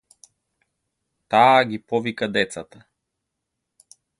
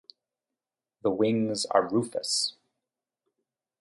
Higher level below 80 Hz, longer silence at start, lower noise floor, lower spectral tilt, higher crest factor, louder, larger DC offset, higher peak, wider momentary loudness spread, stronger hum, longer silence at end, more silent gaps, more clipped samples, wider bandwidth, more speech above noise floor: first, -64 dBFS vs -72 dBFS; first, 1.3 s vs 1.05 s; second, -80 dBFS vs -90 dBFS; about the same, -4.5 dB/octave vs -4 dB/octave; about the same, 22 dB vs 22 dB; first, -20 LUFS vs -27 LUFS; neither; first, -2 dBFS vs -8 dBFS; first, 11 LU vs 6 LU; neither; first, 1.55 s vs 1.3 s; neither; neither; about the same, 11.5 kHz vs 11.5 kHz; about the same, 61 dB vs 63 dB